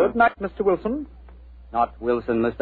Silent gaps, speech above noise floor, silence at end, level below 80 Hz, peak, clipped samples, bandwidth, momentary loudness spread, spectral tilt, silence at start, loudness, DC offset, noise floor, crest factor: none; 21 dB; 0 s; -44 dBFS; -6 dBFS; under 0.1%; 4.6 kHz; 10 LU; -9.5 dB/octave; 0 s; -23 LUFS; under 0.1%; -44 dBFS; 18 dB